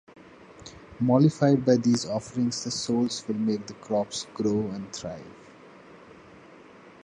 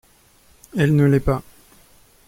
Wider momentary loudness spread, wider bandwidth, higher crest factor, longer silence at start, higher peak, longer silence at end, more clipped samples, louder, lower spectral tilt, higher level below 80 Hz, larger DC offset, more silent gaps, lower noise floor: first, 22 LU vs 11 LU; second, 10.5 kHz vs 16 kHz; about the same, 20 dB vs 16 dB; second, 0.4 s vs 0.75 s; second, -8 dBFS vs -4 dBFS; second, 0.15 s vs 0.85 s; neither; second, -26 LUFS vs -19 LUFS; second, -6 dB/octave vs -8 dB/octave; second, -62 dBFS vs -38 dBFS; neither; neither; second, -50 dBFS vs -54 dBFS